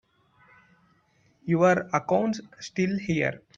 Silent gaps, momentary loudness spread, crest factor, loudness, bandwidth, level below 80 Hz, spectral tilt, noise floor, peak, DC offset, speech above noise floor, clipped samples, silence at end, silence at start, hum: none; 14 LU; 20 dB; -26 LUFS; 7.6 kHz; -64 dBFS; -6.5 dB/octave; -65 dBFS; -8 dBFS; under 0.1%; 40 dB; under 0.1%; 0.2 s; 1.45 s; none